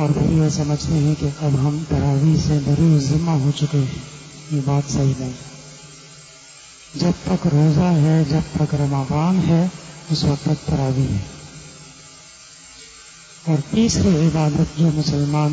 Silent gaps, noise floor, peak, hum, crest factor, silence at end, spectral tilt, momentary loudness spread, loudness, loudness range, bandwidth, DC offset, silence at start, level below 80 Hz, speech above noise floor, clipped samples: none; -42 dBFS; -6 dBFS; none; 14 dB; 0 s; -7 dB/octave; 23 LU; -19 LUFS; 6 LU; 8 kHz; under 0.1%; 0 s; -38 dBFS; 25 dB; under 0.1%